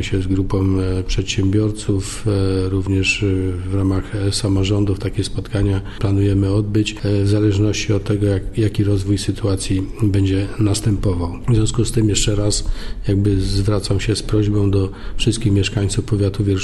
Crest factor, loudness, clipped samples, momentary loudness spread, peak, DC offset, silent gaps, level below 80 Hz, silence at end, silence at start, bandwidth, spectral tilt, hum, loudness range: 12 dB; -19 LUFS; under 0.1%; 5 LU; -4 dBFS; under 0.1%; none; -28 dBFS; 0 s; 0 s; 12 kHz; -6 dB/octave; none; 1 LU